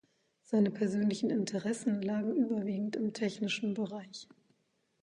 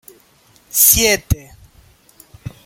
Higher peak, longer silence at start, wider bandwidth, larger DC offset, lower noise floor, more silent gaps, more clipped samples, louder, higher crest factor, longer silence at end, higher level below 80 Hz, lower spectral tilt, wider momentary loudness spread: second, -18 dBFS vs 0 dBFS; second, 0.5 s vs 0.75 s; second, 10.5 kHz vs 17 kHz; neither; first, -76 dBFS vs -52 dBFS; neither; neither; second, -33 LUFS vs -13 LUFS; about the same, 16 dB vs 20 dB; first, 0.8 s vs 0.15 s; second, -78 dBFS vs -34 dBFS; first, -6 dB/octave vs -2 dB/octave; second, 7 LU vs 25 LU